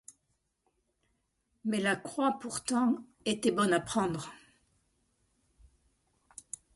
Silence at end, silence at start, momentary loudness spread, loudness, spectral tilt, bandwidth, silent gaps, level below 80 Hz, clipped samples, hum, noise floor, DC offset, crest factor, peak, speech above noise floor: 2.4 s; 1.65 s; 17 LU; -31 LUFS; -4 dB/octave; 11.5 kHz; none; -68 dBFS; under 0.1%; none; -79 dBFS; under 0.1%; 20 dB; -16 dBFS; 48 dB